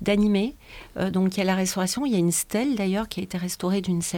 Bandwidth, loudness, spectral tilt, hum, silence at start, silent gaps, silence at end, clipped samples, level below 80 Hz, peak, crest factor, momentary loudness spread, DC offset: 18 kHz; -25 LUFS; -5 dB/octave; none; 0 s; none; 0 s; under 0.1%; -50 dBFS; -8 dBFS; 16 dB; 8 LU; under 0.1%